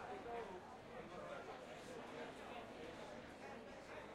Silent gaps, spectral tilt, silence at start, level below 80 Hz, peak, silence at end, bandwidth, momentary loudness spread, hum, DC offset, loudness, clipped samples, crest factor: none; -4.5 dB/octave; 0 s; -74 dBFS; -36 dBFS; 0 s; 16 kHz; 5 LU; none; under 0.1%; -53 LUFS; under 0.1%; 16 dB